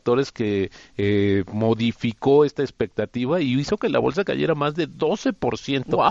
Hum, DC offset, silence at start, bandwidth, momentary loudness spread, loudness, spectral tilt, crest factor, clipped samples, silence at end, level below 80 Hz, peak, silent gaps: none; under 0.1%; 0.05 s; 7.6 kHz; 7 LU; -22 LUFS; -6.5 dB/octave; 16 dB; under 0.1%; 0 s; -54 dBFS; -4 dBFS; none